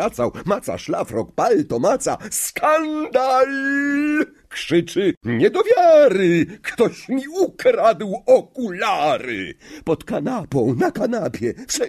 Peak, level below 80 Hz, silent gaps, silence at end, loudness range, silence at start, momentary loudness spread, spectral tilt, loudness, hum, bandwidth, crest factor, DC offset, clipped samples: -4 dBFS; -54 dBFS; 5.17-5.21 s; 0 s; 4 LU; 0 s; 9 LU; -5 dB/octave; -19 LUFS; none; 13.5 kHz; 16 dB; under 0.1%; under 0.1%